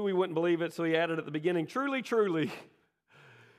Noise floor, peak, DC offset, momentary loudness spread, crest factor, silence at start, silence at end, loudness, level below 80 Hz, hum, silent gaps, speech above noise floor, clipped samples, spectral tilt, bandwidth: -62 dBFS; -16 dBFS; under 0.1%; 4 LU; 16 dB; 0 s; 0.95 s; -31 LUFS; -86 dBFS; none; none; 32 dB; under 0.1%; -6.5 dB/octave; 14 kHz